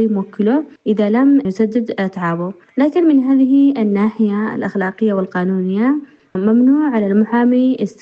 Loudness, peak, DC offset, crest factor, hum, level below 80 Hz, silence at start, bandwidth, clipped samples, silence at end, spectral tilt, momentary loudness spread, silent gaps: -15 LUFS; -4 dBFS; under 0.1%; 12 dB; none; -62 dBFS; 0 s; 6.8 kHz; under 0.1%; 0.1 s; -9 dB/octave; 8 LU; none